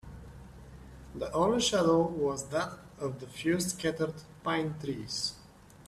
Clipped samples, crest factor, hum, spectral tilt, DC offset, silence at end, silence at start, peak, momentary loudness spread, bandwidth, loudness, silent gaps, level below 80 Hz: under 0.1%; 18 dB; none; -4.5 dB/octave; under 0.1%; 0 s; 0.05 s; -16 dBFS; 24 LU; 14 kHz; -31 LUFS; none; -56 dBFS